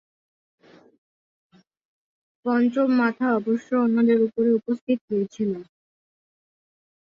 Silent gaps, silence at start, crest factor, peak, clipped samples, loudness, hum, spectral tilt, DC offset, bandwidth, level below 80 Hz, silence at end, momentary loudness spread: 4.81-4.87 s, 5.01-5.08 s; 2.45 s; 16 dB; -8 dBFS; under 0.1%; -23 LUFS; none; -8 dB/octave; under 0.1%; 7 kHz; -72 dBFS; 1.4 s; 8 LU